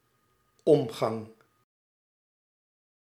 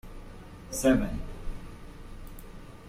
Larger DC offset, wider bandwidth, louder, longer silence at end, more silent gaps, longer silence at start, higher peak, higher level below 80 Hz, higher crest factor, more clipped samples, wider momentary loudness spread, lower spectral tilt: neither; second, 14.5 kHz vs 16 kHz; about the same, -27 LUFS vs -28 LUFS; first, 1.8 s vs 0 s; neither; first, 0.65 s vs 0.05 s; first, -8 dBFS vs -12 dBFS; second, -76 dBFS vs -40 dBFS; about the same, 24 dB vs 22 dB; neither; second, 16 LU vs 23 LU; first, -7 dB/octave vs -5 dB/octave